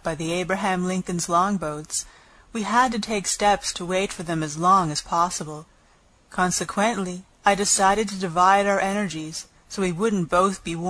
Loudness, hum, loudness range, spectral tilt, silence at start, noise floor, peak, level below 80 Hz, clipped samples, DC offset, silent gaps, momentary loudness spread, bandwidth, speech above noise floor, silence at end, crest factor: -22 LUFS; none; 3 LU; -3.5 dB/octave; 0.05 s; -57 dBFS; -4 dBFS; -50 dBFS; under 0.1%; under 0.1%; none; 13 LU; 11 kHz; 35 dB; 0 s; 20 dB